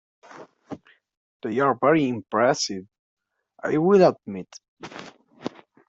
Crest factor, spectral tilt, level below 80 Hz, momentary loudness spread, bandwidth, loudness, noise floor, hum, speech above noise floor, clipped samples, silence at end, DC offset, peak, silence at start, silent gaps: 20 dB; -5.5 dB/octave; -68 dBFS; 24 LU; 8 kHz; -21 LUFS; -45 dBFS; none; 23 dB; under 0.1%; 0.4 s; under 0.1%; -6 dBFS; 0.35 s; 1.17-1.40 s, 2.99-3.17 s, 4.68-4.77 s